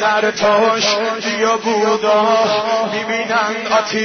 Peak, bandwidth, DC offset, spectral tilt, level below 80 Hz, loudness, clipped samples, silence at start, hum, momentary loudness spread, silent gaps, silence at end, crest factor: -4 dBFS; 6.6 kHz; under 0.1%; -3 dB/octave; -58 dBFS; -15 LUFS; under 0.1%; 0 s; none; 5 LU; none; 0 s; 12 dB